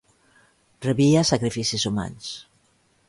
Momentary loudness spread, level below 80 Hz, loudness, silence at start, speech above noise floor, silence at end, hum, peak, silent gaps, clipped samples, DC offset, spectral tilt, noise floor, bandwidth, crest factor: 17 LU; -52 dBFS; -22 LUFS; 0.8 s; 42 dB; 0.65 s; none; -8 dBFS; none; under 0.1%; under 0.1%; -5 dB/octave; -64 dBFS; 11.5 kHz; 18 dB